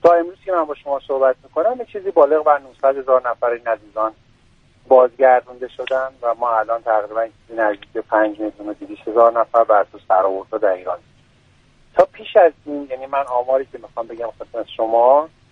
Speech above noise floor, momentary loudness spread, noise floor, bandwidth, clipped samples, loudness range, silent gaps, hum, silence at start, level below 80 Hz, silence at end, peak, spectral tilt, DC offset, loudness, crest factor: 36 dB; 14 LU; -54 dBFS; 6.2 kHz; under 0.1%; 2 LU; none; none; 0.05 s; -58 dBFS; 0.25 s; 0 dBFS; -6 dB/octave; under 0.1%; -18 LUFS; 18 dB